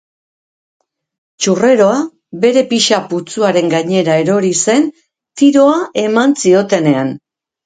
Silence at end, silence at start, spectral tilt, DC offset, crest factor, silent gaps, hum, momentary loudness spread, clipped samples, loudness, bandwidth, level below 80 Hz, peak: 0.5 s; 1.4 s; -4.5 dB/octave; under 0.1%; 14 dB; none; none; 9 LU; under 0.1%; -12 LUFS; 9.6 kHz; -60 dBFS; 0 dBFS